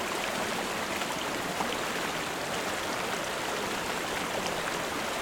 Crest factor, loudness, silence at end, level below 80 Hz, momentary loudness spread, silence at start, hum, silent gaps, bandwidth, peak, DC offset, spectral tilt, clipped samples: 16 dB; -31 LUFS; 0 s; -58 dBFS; 1 LU; 0 s; none; none; over 20 kHz; -16 dBFS; under 0.1%; -2.5 dB/octave; under 0.1%